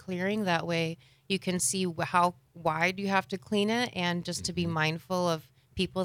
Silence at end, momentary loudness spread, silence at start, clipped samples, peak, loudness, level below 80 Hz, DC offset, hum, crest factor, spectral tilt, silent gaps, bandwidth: 0 s; 7 LU; 0.05 s; under 0.1%; -12 dBFS; -30 LUFS; -62 dBFS; under 0.1%; none; 18 dB; -4 dB/octave; none; 16.5 kHz